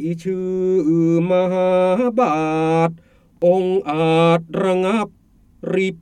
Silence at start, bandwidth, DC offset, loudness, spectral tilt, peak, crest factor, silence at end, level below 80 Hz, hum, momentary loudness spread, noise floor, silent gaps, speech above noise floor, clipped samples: 0 s; 9.6 kHz; under 0.1%; -18 LUFS; -7.5 dB/octave; -4 dBFS; 14 dB; 0.05 s; -56 dBFS; none; 7 LU; -40 dBFS; none; 23 dB; under 0.1%